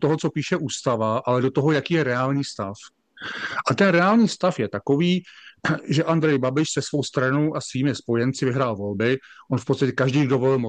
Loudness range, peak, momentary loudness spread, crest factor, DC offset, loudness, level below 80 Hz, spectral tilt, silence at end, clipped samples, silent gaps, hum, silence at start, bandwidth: 3 LU; -4 dBFS; 9 LU; 18 dB; under 0.1%; -22 LUFS; -64 dBFS; -6 dB/octave; 0 s; under 0.1%; none; none; 0 s; 9.8 kHz